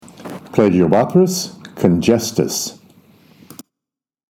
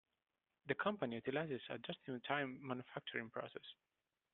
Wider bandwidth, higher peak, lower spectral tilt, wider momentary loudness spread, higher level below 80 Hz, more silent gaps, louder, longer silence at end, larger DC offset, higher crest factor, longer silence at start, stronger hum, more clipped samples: first, 19 kHz vs 4.3 kHz; first, 0 dBFS vs -24 dBFS; first, -5.5 dB/octave vs -3.5 dB/octave; first, 14 LU vs 10 LU; first, -50 dBFS vs -84 dBFS; neither; first, -16 LUFS vs -44 LUFS; first, 1.65 s vs 0.6 s; neither; about the same, 18 dB vs 22 dB; second, 0.2 s vs 0.65 s; neither; neither